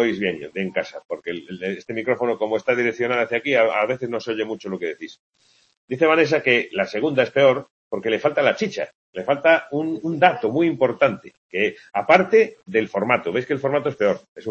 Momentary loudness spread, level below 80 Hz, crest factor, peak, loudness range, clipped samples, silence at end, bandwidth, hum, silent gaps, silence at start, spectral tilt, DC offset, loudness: 13 LU; -66 dBFS; 20 dB; 0 dBFS; 3 LU; under 0.1%; 0 s; 7.4 kHz; none; 1.05-1.09 s, 5.19-5.33 s, 5.77-5.88 s, 7.71-7.91 s, 8.95-9.13 s, 11.37-11.49 s, 14.28-14.36 s; 0 s; -6 dB/octave; under 0.1%; -21 LUFS